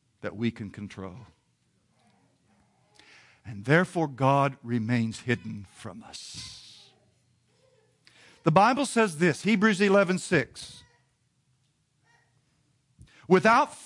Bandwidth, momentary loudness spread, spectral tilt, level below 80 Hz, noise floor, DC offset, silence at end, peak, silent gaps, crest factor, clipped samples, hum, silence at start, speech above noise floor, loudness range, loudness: 11.5 kHz; 21 LU; -5.5 dB/octave; -68 dBFS; -71 dBFS; under 0.1%; 0 s; -6 dBFS; none; 22 dB; under 0.1%; none; 0.25 s; 45 dB; 14 LU; -25 LUFS